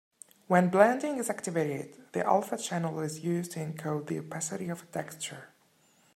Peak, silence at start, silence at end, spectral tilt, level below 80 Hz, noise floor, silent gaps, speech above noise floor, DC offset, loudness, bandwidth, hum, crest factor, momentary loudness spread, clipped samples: -6 dBFS; 0.5 s; 0.7 s; -5.5 dB/octave; -76 dBFS; -66 dBFS; none; 36 dB; under 0.1%; -31 LUFS; 16 kHz; none; 24 dB; 14 LU; under 0.1%